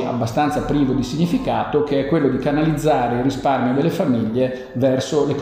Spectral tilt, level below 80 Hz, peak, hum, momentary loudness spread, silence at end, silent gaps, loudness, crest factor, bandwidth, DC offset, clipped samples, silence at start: -7 dB/octave; -42 dBFS; -4 dBFS; none; 2 LU; 0 s; none; -19 LUFS; 14 dB; 15.5 kHz; under 0.1%; under 0.1%; 0 s